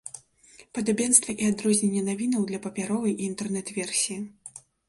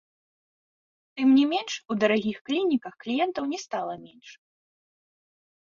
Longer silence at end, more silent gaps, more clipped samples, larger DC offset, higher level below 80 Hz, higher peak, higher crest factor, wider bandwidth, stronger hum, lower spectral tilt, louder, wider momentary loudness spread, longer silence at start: second, 0.3 s vs 1.45 s; second, none vs 2.41-2.45 s; neither; neither; first, -66 dBFS vs -72 dBFS; first, -4 dBFS vs -8 dBFS; about the same, 24 dB vs 20 dB; first, 11.5 kHz vs 7.4 kHz; neither; about the same, -3.5 dB/octave vs -4.5 dB/octave; about the same, -25 LUFS vs -26 LUFS; first, 19 LU vs 12 LU; second, 0.05 s vs 1.15 s